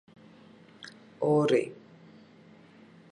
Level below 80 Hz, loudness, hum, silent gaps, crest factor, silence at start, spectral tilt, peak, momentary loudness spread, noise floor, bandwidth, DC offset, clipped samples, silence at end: -80 dBFS; -27 LUFS; none; none; 20 dB; 0.85 s; -7 dB/octave; -12 dBFS; 24 LU; -55 dBFS; 11 kHz; under 0.1%; under 0.1%; 1.4 s